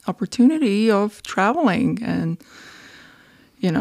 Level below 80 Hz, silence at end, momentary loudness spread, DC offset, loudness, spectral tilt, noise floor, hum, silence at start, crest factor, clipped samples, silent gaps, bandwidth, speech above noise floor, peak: -56 dBFS; 0 s; 9 LU; under 0.1%; -20 LUFS; -6.5 dB/octave; -51 dBFS; none; 0.05 s; 16 dB; under 0.1%; none; 13 kHz; 32 dB; -6 dBFS